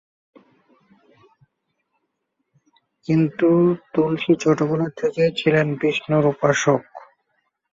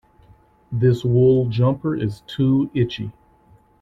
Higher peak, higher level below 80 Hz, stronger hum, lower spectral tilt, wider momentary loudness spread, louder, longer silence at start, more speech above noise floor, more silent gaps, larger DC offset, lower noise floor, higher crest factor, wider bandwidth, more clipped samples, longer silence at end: about the same, -4 dBFS vs -6 dBFS; second, -62 dBFS vs -50 dBFS; neither; second, -6 dB/octave vs -9 dB/octave; second, 5 LU vs 12 LU; about the same, -20 LUFS vs -20 LUFS; first, 3.1 s vs 0.7 s; first, 56 dB vs 35 dB; neither; neither; first, -75 dBFS vs -54 dBFS; about the same, 18 dB vs 14 dB; about the same, 7.8 kHz vs 7.4 kHz; neither; about the same, 0.75 s vs 0.7 s